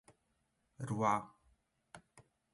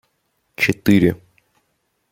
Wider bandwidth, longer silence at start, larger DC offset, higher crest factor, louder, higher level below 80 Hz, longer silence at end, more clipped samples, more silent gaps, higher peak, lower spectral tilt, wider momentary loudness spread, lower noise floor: second, 11.5 kHz vs 16.5 kHz; first, 0.8 s vs 0.6 s; neither; about the same, 24 dB vs 20 dB; second, -37 LUFS vs -17 LUFS; second, -74 dBFS vs -50 dBFS; second, 0.35 s vs 0.95 s; neither; neither; second, -20 dBFS vs -2 dBFS; about the same, -6.5 dB/octave vs -6.5 dB/octave; first, 25 LU vs 20 LU; first, -81 dBFS vs -69 dBFS